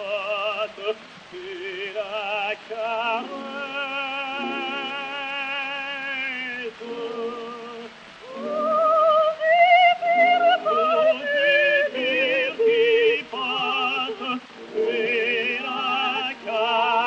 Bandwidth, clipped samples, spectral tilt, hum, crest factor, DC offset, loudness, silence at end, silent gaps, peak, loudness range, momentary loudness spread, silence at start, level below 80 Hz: 8.4 kHz; under 0.1%; -3 dB/octave; none; 16 dB; under 0.1%; -22 LUFS; 0 s; none; -8 dBFS; 10 LU; 15 LU; 0 s; -72 dBFS